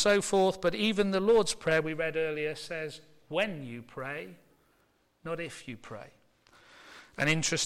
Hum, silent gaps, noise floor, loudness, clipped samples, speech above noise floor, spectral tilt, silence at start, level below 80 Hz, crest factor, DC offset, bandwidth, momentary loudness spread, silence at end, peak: none; none; -70 dBFS; -30 LUFS; under 0.1%; 40 dB; -3.5 dB/octave; 0 s; -60 dBFS; 16 dB; under 0.1%; 15.5 kHz; 21 LU; 0 s; -14 dBFS